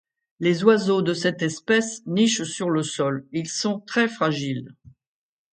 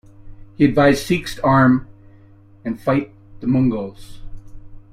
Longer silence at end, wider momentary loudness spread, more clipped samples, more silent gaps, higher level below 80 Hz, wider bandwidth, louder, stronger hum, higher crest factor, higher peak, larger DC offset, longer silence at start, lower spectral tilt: first, 0.8 s vs 0.15 s; second, 9 LU vs 15 LU; neither; neither; second, -68 dBFS vs -40 dBFS; second, 9.4 kHz vs 15.5 kHz; second, -23 LUFS vs -18 LUFS; neither; about the same, 20 dB vs 16 dB; about the same, -2 dBFS vs -2 dBFS; neither; first, 0.4 s vs 0.25 s; second, -4.5 dB/octave vs -7 dB/octave